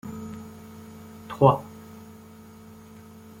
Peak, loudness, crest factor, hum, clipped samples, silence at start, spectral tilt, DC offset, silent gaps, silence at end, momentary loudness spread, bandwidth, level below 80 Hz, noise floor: -2 dBFS; -23 LUFS; 26 dB; none; under 0.1%; 0.05 s; -8 dB/octave; under 0.1%; none; 0 s; 27 LU; 16.5 kHz; -60 dBFS; -47 dBFS